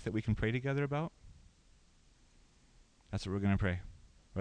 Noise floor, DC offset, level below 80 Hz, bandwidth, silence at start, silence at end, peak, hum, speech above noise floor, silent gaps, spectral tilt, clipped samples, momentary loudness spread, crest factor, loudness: -65 dBFS; under 0.1%; -52 dBFS; 9.6 kHz; 0 s; 0 s; -20 dBFS; none; 31 dB; none; -7.5 dB/octave; under 0.1%; 11 LU; 18 dB; -36 LUFS